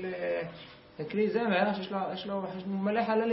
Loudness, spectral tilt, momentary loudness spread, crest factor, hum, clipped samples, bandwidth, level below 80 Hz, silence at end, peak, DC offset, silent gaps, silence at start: -31 LUFS; -10 dB/octave; 14 LU; 16 dB; none; under 0.1%; 5.8 kHz; -70 dBFS; 0 s; -14 dBFS; under 0.1%; none; 0 s